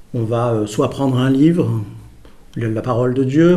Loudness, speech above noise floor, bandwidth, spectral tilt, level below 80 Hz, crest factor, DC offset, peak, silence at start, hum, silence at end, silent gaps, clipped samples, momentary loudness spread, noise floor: -17 LUFS; 25 dB; 13 kHz; -8 dB/octave; -46 dBFS; 14 dB; under 0.1%; -2 dBFS; 0 s; none; 0 s; none; under 0.1%; 11 LU; -40 dBFS